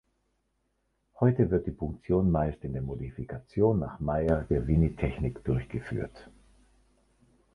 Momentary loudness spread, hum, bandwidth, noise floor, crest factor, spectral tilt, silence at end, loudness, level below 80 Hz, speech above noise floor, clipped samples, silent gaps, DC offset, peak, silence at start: 11 LU; none; 10.5 kHz; -76 dBFS; 18 dB; -10.5 dB/octave; 1.3 s; -29 LUFS; -42 dBFS; 48 dB; under 0.1%; none; under 0.1%; -12 dBFS; 1.2 s